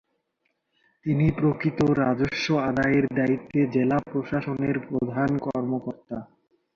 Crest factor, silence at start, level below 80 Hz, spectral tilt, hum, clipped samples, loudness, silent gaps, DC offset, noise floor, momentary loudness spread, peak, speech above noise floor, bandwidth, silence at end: 16 dB; 1.05 s; -52 dBFS; -7.5 dB/octave; none; under 0.1%; -25 LUFS; none; under 0.1%; -75 dBFS; 8 LU; -10 dBFS; 51 dB; 7.2 kHz; 0.5 s